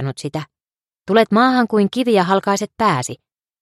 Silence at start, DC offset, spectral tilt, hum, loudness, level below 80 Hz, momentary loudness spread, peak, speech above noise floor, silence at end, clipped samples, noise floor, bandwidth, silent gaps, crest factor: 0 s; under 0.1%; -5.5 dB/octave; none; -17 LUFS; -60 dBFS; 14 LU; 0 dBFS; over 74 dB; 0.45 s; under 0.1%; under -90 dBFS; 14 kHz; none; 18 dB